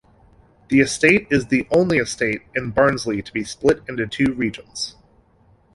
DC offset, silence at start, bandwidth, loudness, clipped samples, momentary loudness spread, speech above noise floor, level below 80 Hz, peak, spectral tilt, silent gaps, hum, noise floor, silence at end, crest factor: under 0.1%; 0.7 s; 11.5 kHz; -20 LUFS; under 0.1%; 12 LU; 36 dB; -48 dBFS; -2 dBFS; -5 dB/octave; none; none; -56 dBFS; 0.85 s; 20 dB